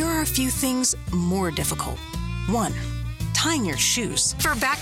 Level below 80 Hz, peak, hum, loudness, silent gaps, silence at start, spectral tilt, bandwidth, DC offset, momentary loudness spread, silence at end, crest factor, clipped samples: -36 dBFS; -10 dBFS; none; -23 LUFS; none; 0 s; -3 dB/octave; 17 kHz; under 0.1%; 9 LU; 0 s; 14 dB; under 0.1%